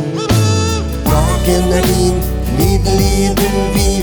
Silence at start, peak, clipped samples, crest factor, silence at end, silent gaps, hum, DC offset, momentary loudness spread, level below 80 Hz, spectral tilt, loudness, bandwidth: 0 s; 0 dBFS; under 0.1%; 12 dB; 0 s; none; none; under 0.1%; 3 LU; -18 dBFS; -5.5 dB/octave; -14 LUFS; over 20 kHz